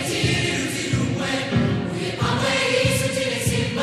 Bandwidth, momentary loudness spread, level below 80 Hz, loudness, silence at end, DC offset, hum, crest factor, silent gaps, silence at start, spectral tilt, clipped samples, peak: 14.5 kHz; 5 LU; -42 dBFS; -21 LUFS; 0 s; under 0.1%; none; 16 dB; none; 0 s; -4.5 dB/octave; under 0.1%; -6 dBFS